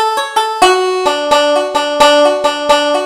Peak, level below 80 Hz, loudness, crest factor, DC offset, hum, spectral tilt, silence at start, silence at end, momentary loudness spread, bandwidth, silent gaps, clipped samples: 0 dBFS; -46 dBFS; -11 LUFS; 12 dB; under 0.1%; none; -1.5 dB/octave; 0 s; 0 s; 6 LU; 16 kHz; none; under 0.1%